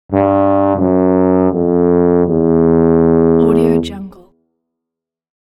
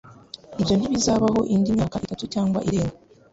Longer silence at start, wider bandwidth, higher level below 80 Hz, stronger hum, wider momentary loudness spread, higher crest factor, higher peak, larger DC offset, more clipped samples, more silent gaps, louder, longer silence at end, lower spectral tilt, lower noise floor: about the same, 0.1 s vs 0.05 s; first, 11.5 kHz vs 8 kHz; about the same, -44 dBFS vs -46 dBFS; neither; second, 3 LU vs 11 LU; second, 10 dB vs 16 dB; first, -2 dBFS vs -8 dBFS; neither; neither; neither; first, -12 LUFS vs -23 LUFS; first, 1.35 s vs 0.35 s; first, -9.5 dB/octave vs -6 dB/octave; first, -82 dBFS vs -43 dBFS